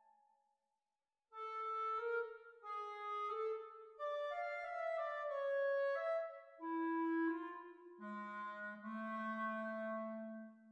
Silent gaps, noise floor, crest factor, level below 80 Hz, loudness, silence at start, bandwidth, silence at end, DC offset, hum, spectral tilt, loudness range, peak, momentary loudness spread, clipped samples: none; under -90 dBFS; 12 dB; under -90 dBFS; -43 LUFS; 1.35 s; 7.4 kHz; 0 s; under 0.1%; none; -6.5 dB/octave; 5 LU; -32 dBFS; 12 LU; under 0.1%